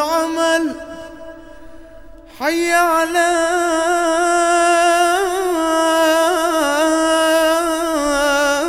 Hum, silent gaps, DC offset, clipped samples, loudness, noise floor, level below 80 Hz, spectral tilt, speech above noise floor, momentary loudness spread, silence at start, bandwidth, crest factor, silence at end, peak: none; none; under 0.1%; under 0.1%; -15 LUFS; -39 dBFS; -46 dBFS; -1.5 dB/octave; 23 dB; 6 LU; 0 s; 16.5 kHz; 14 dB; 0 s; -2 dBFS